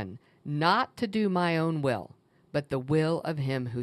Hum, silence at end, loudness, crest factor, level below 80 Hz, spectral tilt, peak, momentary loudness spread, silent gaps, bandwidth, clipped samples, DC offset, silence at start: none; 0 s; -29 LUFS; 20 dB; -66 dBFS; -7 dB/octave; -10 dBFS; 10 LU; none; 12.5 kHz; under 0.1%; under 0.1%; 0 s